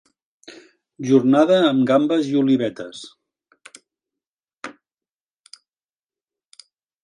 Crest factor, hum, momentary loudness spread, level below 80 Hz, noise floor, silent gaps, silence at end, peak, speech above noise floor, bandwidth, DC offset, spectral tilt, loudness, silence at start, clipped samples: 20 dB; none; 23 LU; -72 dBFS; under -90 dBFS; 4.27-4.37 s; 2.3 s; -2 dBFS; over 73 dB; 10.5 kHz; under 0.1%; -6.5 dB/octave; -17 LUFS; 0.5 s; under 0.1%